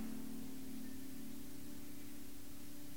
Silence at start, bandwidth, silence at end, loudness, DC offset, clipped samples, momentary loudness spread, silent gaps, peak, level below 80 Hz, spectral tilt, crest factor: 0 s; 19.5 kHz; 0 s; -51 LUFS; 0.7%; under 0.1%; 5 LU; none; -34 dBFS; -66 dBFS; -4.5 dB/octave; 14 dB